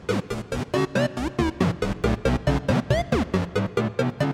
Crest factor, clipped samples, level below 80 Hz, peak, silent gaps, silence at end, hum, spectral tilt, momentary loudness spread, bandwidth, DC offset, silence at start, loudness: 16 dB; under 0.1%; -36 dBFS; -8 dBFS; none; 0 s; none; -6.5 dB/octave; 4 LU; 15.5 kHz; under 0.1%; 0 s; -25 LUFS